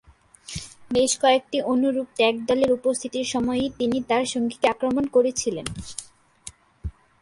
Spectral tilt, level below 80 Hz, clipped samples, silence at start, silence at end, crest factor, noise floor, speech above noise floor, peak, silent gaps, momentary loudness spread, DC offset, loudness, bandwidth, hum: -3.5 dB/octave; -48 dBFS; under 0.1%; 0.5 s; 0.3 s; 18 dB; -47 dBFS; 24 dB; -6 dBFS; none; 19 LU; under 0.1%; -23 LUFS; 11.5 kHz; none